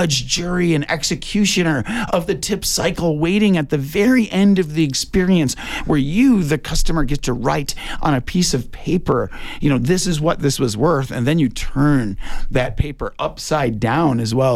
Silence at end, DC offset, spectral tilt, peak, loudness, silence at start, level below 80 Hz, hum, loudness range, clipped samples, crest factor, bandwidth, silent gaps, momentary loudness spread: 0 s; under 0.1%; -5 dB/octave; -4 dBFS; -18 LUFS; 0 s; -30 dBFS; none; 3 LU; under 0.1%; 12 dB; 16 kHz; none; 7 LU